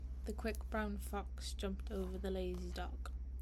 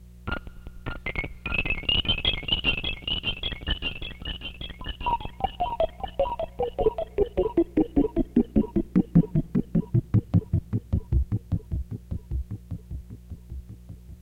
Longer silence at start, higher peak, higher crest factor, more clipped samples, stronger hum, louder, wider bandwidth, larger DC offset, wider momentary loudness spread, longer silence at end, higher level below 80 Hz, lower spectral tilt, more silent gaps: about the same, 0 s vs 0 s; second, -26 dBFS vs -6 dBFS; second, 16 dB vs 22 dB; neither; neither; second, -44 LUFS vs -27 LUFS; about the same, 15 kHz vs 15 kHz; neither; second, 5 LU vs 15 LU; about the same, 0 s vs 0 s; second, -44 dBFS vs -36 dBFS; second, -6 dB/octave vs -7.5 dB/octave; neither